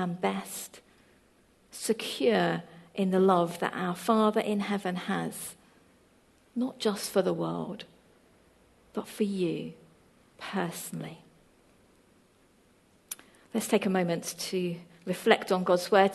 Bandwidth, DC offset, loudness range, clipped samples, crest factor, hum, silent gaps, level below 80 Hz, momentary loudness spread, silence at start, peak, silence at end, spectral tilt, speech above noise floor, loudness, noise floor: 13 kHz; under 0.1%; 10 LU; under 0.1%; 26 dB; none; none; -72 dBFS; 17 LU; 0 s; -4 dBFS; 0 s; -5 dB/octave; 35 dB; -30 LUFS; -63 dBFS